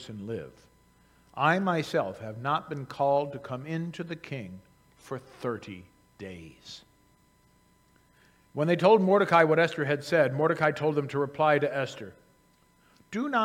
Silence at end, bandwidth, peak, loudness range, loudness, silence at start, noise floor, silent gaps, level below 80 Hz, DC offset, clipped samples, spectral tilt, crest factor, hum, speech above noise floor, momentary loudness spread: 0 s; 15 kHz; -6 dBFS; 18 LU; -27 LUFS; 0 s; -64 dBFS; none; -70 dBFS; under 0.1%; under 0.1%; -6.5 dB/octave; 22 dB; none; 36 dB; 23 LU